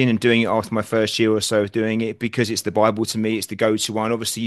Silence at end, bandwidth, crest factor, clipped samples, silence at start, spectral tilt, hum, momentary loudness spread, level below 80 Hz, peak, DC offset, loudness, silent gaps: 0 s; 12.5 kHz; 18 dB; under 0.1%; 0 s; -4.5 dB/octave; none; 5 LU; -60 dBFS; -2 dBFS; under 0.1%; -20 LUFS; none